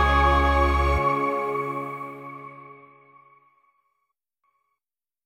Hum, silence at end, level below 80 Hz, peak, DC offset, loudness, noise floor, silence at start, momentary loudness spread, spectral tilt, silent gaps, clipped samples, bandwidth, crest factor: none; 2.5 s; -30 dBFS; -8 dBFS; under 0.1%; -22 LUFS; under -90 dBFS; 0 s; 21 LU; -6.5 dB/octave; none; under 0.1%; 13 kHz; 18 dB